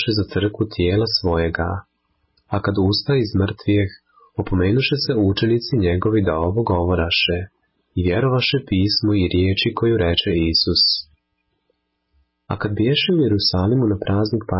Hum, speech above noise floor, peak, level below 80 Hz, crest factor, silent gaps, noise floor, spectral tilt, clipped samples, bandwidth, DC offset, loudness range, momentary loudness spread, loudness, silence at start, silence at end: none; 53 dB; -6 dBFS; -34 dBFS; 14 dB; none; -71 dBFS; -9.5 dB/octave; under 0.1%; 5.8 kHz; under 0.1%; 3 LU; 8 LU; -19 LUFS; 0 s; 0 s